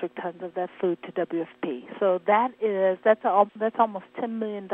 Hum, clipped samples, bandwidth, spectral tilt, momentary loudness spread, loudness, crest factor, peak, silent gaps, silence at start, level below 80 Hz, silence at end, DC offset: none; under 0.1%; 3.9 kHz; -9 dB/octave; 11 LU; -26 LUFS; 20 dB; -6 dBFS; none; 0 s; -82 dBFS; 0 s; under 0.1%